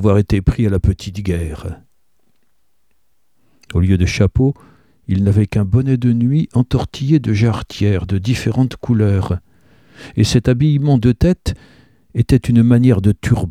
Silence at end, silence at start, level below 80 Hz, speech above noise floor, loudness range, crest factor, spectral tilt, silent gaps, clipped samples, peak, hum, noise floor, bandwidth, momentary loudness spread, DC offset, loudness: 0 s; 0 s; -30 dBFS; 54 dB; 6 LU; 14 dB; -7.5 dB/octave; none; under 0.1%; 0 dBFS; none; -68 dBFS; 13 kHz; 10 LU; 0.2%; -16 LUFS